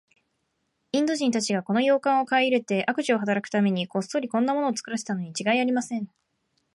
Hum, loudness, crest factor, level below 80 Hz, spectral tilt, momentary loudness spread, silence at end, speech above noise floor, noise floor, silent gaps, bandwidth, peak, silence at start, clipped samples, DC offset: none; -25 LUFS; 16 dB; -76 dBFS; -4.5 dB/octave; 8 LU; 0.7 s; 51 dB; -75 dBFS; none; 11.5 kHz; -10 dBFS; 0.95 s; under 0.1%; under 0.1%